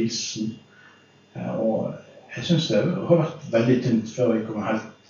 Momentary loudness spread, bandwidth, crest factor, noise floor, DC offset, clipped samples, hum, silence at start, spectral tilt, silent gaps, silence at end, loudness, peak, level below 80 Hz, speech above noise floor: 14 LU; 7.4 kHz; 18 dB; -53 dBFS; under 0.1%; under 0.1%; none; 0 s; -6 dB/octave; none; 0.15 s; -24 LUFS; -6 dBFS; -66 dBFS; 30 dB